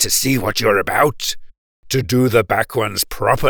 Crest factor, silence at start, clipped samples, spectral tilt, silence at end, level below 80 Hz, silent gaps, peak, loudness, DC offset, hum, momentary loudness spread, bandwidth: 16 dB; 0 s; under 0.1%; -3.5 dB/octave; 0 s; -38 dBFS; 1.58-1.83 s; -2 dBFS; -17 LUFS; under 0.1%; none; 8 LU; over 20 kHz